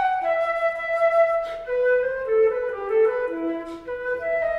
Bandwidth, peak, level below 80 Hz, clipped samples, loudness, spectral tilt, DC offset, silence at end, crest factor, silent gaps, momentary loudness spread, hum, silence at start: 7.8 kHz; -10 dBFS; -54 dBFS; under 0.1%; -23 LUFS; -5 dB/octave; under 0.1%; 0 s; 14 dB; none; 8 LU; none; 0 s